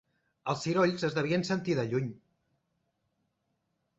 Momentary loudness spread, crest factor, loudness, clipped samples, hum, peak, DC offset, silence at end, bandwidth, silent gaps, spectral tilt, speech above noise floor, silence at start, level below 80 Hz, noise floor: 9 LU; 18 dB; -31 LUFS; under 0.1%; none; -14 dBFS; under 0.1%; 1.85 s; 8.2 kHz; none; -6 dB/octave; 50 dB; 0.45 s; -68 dBFS; -79 dBFS